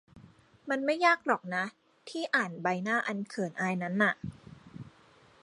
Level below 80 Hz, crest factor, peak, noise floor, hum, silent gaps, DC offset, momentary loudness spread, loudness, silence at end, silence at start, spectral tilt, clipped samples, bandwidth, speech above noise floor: -68 dBFS; 22 dB; -12 dBFS; -60 dBFS; none; none; under 0.1%; 22 LU; -30 LUFS; 0.55 s; 0.15 s; -5.5 dB/octave; under 0.1%; 11.5 kHz; 30 dB